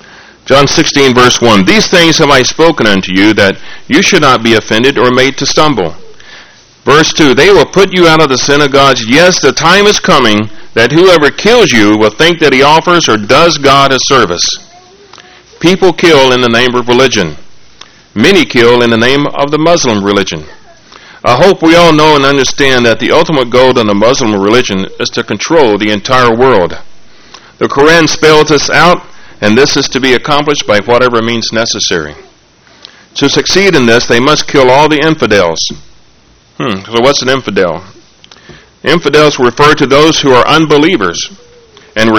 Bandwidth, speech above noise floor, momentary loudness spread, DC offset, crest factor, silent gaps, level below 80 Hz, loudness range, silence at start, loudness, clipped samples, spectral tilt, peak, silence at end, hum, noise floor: 19.5 kHz; 37 dB; 8 LU; under 0.1%; 8 dB; none; -34 dBFS; 4 LU; 0.45 s; -6 LUFS; 4%; -4 dB/octave; 0 dBFS; 0 s; none; -43 dBFS